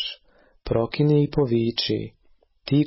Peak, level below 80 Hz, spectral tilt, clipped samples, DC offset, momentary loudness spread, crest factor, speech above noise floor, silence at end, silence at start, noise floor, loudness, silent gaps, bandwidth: -8 dBFS; -48 dBFS; -10 dB/octave; under 0.1%; under 0.1%; 20 LU; 14 dB; 36 dB; 0 s; 0 s; -58 dBFS; -23 LUFS; none; 5.8 kHz